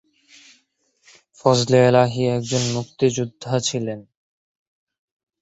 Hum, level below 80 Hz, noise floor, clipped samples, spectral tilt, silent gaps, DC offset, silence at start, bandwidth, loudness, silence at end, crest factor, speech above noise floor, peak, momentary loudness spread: none; -58 dBFS; -65 dBFS; under 0.1%; -5 dB/octave; none; under 0.1%; 1.45 s; 8.2 kHz; -20 LUFS; 1.4 s; 20 dB; 46 dB; -2 dBFS; 12 LU